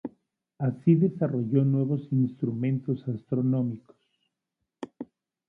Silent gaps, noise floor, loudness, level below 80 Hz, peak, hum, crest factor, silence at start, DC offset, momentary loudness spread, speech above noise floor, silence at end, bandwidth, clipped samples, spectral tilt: none; -84 dBFS; -27 LUFS; -70 dBFS; -10 dBFS; none; 18 dB; 0.05 s; under 0.1%; 19 LU; 58 dB; 0.45 s; 3.9 kHz; under 0.1%; -12 dB/octave